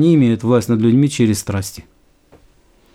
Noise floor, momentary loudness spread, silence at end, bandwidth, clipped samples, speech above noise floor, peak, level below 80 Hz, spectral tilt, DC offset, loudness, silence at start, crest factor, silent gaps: -51 dBFS; 10 LU; 1.15 s; 16 kHz; under 0.1%; 37 dB; -2 dBFS; -50 dBFS; -6.5 dB/octave; under 0.1%; -15 LUFS; 0 s; 14 dB; none